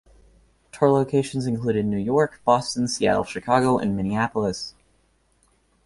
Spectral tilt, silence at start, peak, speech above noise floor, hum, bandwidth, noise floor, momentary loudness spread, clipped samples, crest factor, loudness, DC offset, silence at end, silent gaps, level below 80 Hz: -5.5 dB/octave; 0.75 s; -4 dBFS; 42 dB; none; 11.5 kHz; -64 dBFS; 6 LU; under 0.1%; 20 dB; -22 LUFS; under 0.1%; 1.15 s; none; -52 dBFS